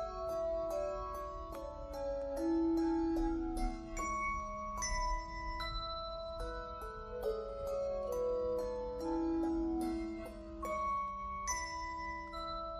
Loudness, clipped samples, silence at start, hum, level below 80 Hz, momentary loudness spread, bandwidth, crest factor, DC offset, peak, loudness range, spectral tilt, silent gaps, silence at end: -39 LUFS; under 0.1%; 0 s; none; -48 dBFS; 9 LU; 13 kHz; 14 dB; under 0.1%; -24 dBFS; 4 LU; -4.5 dB/octave; none; 0 s